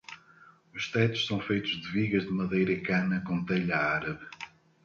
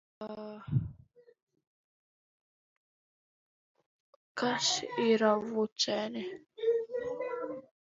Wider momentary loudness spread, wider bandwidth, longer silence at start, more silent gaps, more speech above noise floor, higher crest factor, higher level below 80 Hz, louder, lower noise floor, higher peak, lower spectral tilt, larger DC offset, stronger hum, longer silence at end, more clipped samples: about the same, 16 LU vs 16 LU; about the same, 7.2 kHz vs 7.8 kHz; about the same, 0.1 s vs 0.2 s; second, none vs 1.42-1.47 s, 1.67-3.75 s, 3.86-4.35 s, 5.72-5.76 s; about the same, 29 dB vs 30 dB; about the same, 18 dB vs 22 dB; about the same, -60 dBFS vs -64 dBFS; first, -29 LUFS vs -32 LUFS; about the same, -58 dBFS vs -61 dBFS; about the same, -12 dBFS vs -12 dBFS; first, -6 dB/octave vs -4 dB/octave; neither; neither; first, 0.35 s vs 0.2 s; neither